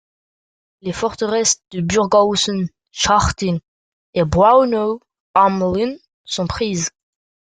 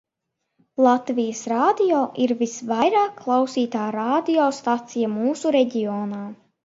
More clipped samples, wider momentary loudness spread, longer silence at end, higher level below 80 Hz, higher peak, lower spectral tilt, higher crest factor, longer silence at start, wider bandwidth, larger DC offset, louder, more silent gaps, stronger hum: neither; first, 12 LU vs 7 LU; first, 0.6 s vs 0.3 s; first, -40 dBFS vs -72 dBFS; about the same, -2 dBFS vs -4 dBFS; about the same, -4 dB/octave vs -5 dB/octave; about the same, 18 dB vs 18 dB; about the same, 0.85 s vs 0.8 s; first, 9.6 kHz vs 8 kHz; neither; first, -17 LUFS vs -21 LUFS; first, 3.68-4.13 s, 5.20-5.34 s, 6.14-6.24 s vs none; neither